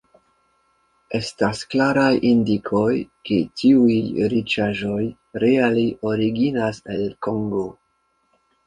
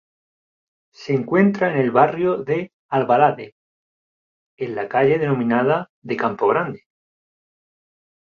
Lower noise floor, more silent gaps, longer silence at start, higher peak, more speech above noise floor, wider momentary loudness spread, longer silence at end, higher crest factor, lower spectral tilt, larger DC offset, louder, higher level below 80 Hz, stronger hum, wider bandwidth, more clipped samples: second, -67 dBFS vs under -90 dBFS; second, none vs 2.73-2.89 s, 3.52-4.58 s, 5.89-6.02 s; about the same, 1.1 s vs 1 s; about the same, -2 dBFS vs 0 dBFS; second, 47 dB vs over 71 dB; second, 10 LU vs 13 LU; second, 0.95 s vs 1.6 s; about the same, 18 dB vs 20 dB; second, -6.5 dB/octave vs -8.5 dB/octave; neither; about the same, -20 LUFS vs -19 LUFS; first, -54 dBFS vs -64 dBFS; neither; first, 11 kHz vs 7 kHz; neither